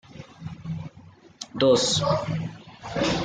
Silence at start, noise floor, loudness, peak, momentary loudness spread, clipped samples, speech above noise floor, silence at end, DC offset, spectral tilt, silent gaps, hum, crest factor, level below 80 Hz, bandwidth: 0.1 s; -50 dBFS; -24 LUFS; -8 dBFS; 21 LU; under 0.1%; 27 dB; 0 s; under 0.1%; -4.5 dB/octave; none; none; 18 dB; -52 dBFS; 9.6 kHz